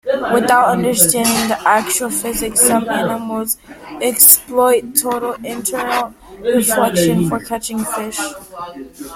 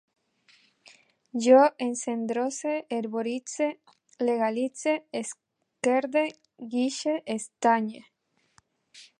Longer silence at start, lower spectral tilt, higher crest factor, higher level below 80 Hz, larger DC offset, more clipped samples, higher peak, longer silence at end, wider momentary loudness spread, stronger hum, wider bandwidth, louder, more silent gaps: second, 0.05 s vs 1.35 s; about the same, -3 dB/octave vs -3.5 dB/octave; second, 16 dB vs 22 dB; first, -46 dBFS vs -84 dBFS; neither; first, 0.1% vs under 0.1%; first, 0 dBFS vs -6 dBFS; second, 0 s vs 0.15 s; about the same, 13 LU vs 14 LU; neither; first, 16.5 kHz vs 11.5 kHz; first, -14 LUFS vs -27 LUFS; neither